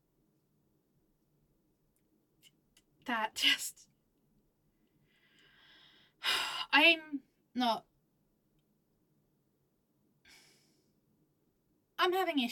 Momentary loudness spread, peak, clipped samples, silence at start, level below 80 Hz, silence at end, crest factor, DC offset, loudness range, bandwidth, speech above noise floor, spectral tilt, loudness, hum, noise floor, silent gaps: 20 LU; -12 dBFS; under 0.1%; 3.05 s; -82 dBFS; 0 s; 26 dB; under 0.1%; 11 LU; 17.5 kHz; 46 dB; -1 dB/octave; -30 LUFS; none; -77 dBFS; none